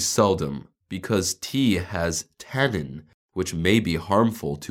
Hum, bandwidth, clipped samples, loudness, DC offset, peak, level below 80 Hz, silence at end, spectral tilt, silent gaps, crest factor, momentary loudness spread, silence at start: none; 17.5 kHz; under 0.1%; -24 LUFS; under 0.1%; -4 dBFS; -48 dBFS; 0 s; -4.5 dB/octave; 3.14-3.29 s; 20 dB; 14 LU; 0 s